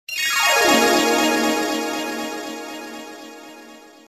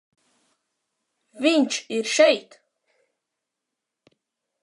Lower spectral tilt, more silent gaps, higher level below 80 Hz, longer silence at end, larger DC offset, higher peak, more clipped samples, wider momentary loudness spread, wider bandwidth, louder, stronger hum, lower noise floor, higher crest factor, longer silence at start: about the same, -1 dB/octave vs -2 dB/octave; neither; first, -58 dBFS vs -88 dBFS; second, 0.25 s vs 2.25 s; neither; about the same, -4 dBFS vs -4 dBFS; neither; first, 22 LU vs 8 LU; first, 15 kHz vs 11.5 kHz; first, -18 LUFS vs -21 LUFS; neither; second, -43 dBFS vs -84 dBFS; about the same, 18 dB vs 22 dB; second, 0.1 s vs 1.35 s